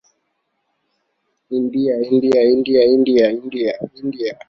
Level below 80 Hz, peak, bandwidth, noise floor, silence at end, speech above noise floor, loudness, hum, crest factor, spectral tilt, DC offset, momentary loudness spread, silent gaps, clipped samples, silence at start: -58 dBFS; -2 dBFS; 7 kHz; -71 dBFS; 0.15 s; 55 dB; -16 LUFS; none; 16 dB; -7 dB/octave; under 0.1%; 11 LU; none; under 0.1%; 1.5 s